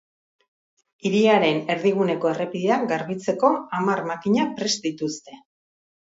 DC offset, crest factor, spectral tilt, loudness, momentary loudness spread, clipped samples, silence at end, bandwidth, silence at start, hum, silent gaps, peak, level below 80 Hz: under 0.1%; 20 dB; -5 dB/octave; -22 LUFS; 9 LU; under 0.1%; 0.75 s; 8 kHz; 1.05 s; none; none; -4 dBFS; -70 dBFS